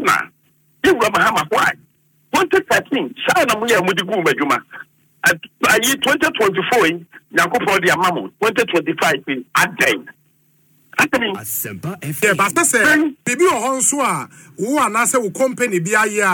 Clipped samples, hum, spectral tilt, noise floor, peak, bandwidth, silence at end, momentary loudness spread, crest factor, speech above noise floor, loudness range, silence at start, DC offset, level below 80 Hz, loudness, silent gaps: under 0.1%; none; -3 dB/octave; -58 dBFS; -2 dBFS; 19 kHz; 0 s; 8 LU; 14 dB; 41 dB; 3 LU; 0 s; under 0.1%; -56 dBFS; -16 LUFS; none